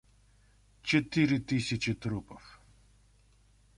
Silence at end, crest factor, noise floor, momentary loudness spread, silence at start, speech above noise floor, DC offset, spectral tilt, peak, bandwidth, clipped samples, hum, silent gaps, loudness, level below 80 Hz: 1.2 s; 20 dB; -64 dBFS; 15 LU; 0.85 s; 33 dB; under 0.1%; -5.5 dB/octave; -14 dBFS; 11.5 kHz; under 0.1%; 50 Hz at -55 dBFS; none; -31 LUFS; -58 dBFS